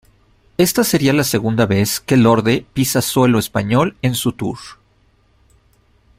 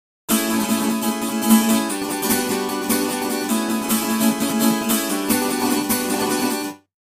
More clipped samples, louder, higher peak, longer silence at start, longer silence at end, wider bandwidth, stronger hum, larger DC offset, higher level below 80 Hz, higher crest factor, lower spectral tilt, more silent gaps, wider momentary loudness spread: neither; first, -16 LUFS vs -20 LUFS; about the same, 0 dBFS vs -2 dBFS; first, 0.6 s vs 0.3 s; first, 1.45 s vs 0.4 s; about the same, 16 kHz vs 16 kHz; neither; neither; first, -48 dBFS vs -58 dBFS; about the same, 16 dB vs 18 dB; first, -5 dB/octave vs -3 dB/octave; neither; first, 8 LU vs 5 LU